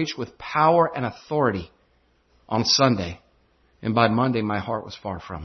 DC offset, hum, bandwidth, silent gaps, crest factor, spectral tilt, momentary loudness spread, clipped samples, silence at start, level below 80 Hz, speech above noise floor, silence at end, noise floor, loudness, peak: under 0.1%; none; 6.4 kHz; none; 20 dB; -5 dB/octave; 15 LU; under 0.1%; 0 s; -56 dBFS; 40 dB; 0 s; -63 dBFS; -23 LUFS; -4 dBFS